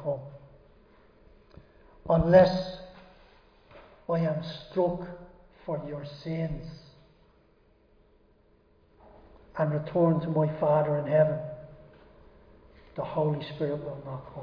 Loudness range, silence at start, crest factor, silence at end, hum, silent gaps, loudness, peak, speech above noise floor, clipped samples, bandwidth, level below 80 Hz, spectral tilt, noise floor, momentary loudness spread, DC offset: 12 LU; 0 s; 24 dB; 0 s; none; none; -28 LUFS; -6 dBFS; 36 dB; under 0.1%; 5.2 kHz; -54 dBFS; -9 dB/octave; -63 dBFS; 21 LU; under 0.1%